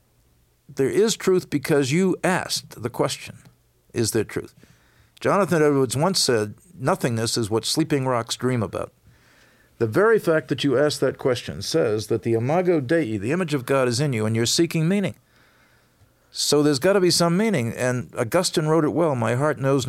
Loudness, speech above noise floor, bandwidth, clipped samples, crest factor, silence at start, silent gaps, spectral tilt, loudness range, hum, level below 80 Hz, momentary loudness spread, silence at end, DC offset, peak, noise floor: -22 LUFS; 40 dB; 16.5 kHz; under 0.1%; 14 dB; 0.7 s; none; -5 dB/octave; 4 LU; none; -60 dBFS; 8 LU; 0 s; under 0.1%; -8 dBFS; -61 dBFS